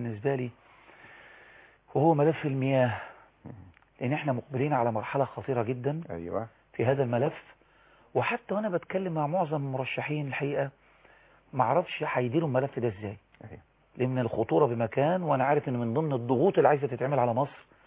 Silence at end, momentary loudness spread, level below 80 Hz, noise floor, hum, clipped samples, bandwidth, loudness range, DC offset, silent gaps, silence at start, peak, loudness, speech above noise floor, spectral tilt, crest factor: 0.25 s; 11 LU; -64 dBFS; -61 dBFS; none; under 0.1%; 4 kHz; 5 LU; under 0.1%; none; 0 s; -10 dBFS; -29 LUFS; 33 dB; -11 dB/octave; 20 dB